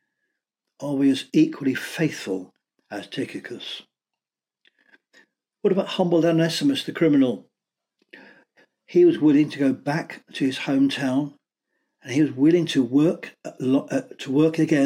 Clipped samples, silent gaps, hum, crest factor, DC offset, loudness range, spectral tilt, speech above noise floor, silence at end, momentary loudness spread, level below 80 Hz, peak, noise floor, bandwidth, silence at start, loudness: under 0.1%; none; none; 16 dB; under 0.1%; 9 LU; -6 dB/octave; 69 dB; 0 s; 15 LU; -76 dBFS; -8 dBFS; -90 dBFS; 15 kHz; 0.8 s; -22 LUFS